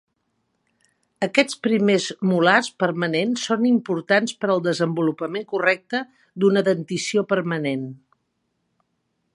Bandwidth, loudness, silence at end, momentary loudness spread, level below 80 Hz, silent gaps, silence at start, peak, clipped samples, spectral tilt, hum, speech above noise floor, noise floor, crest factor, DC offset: 11.5 kHz; -21 LUFS; 1.4 s; 8 LU; -72 dBFS; none; 1.2 s; 0 dBFS; under 0.1%; -5 dB/octave; none; 52 dB; -73 dBFS; 22 dB; under 0.1%